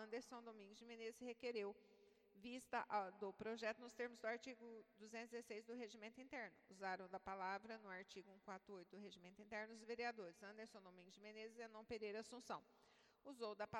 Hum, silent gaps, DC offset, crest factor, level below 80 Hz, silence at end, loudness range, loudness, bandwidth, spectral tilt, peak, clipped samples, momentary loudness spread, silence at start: none; none; under 0.1%; 20 dB; -88 dBFS; 0 s; 5 LU; -54 LUFS; 17 kHz; -4 dB/octave; -32 dBFS; under 0.1%; 12 LU; 0 s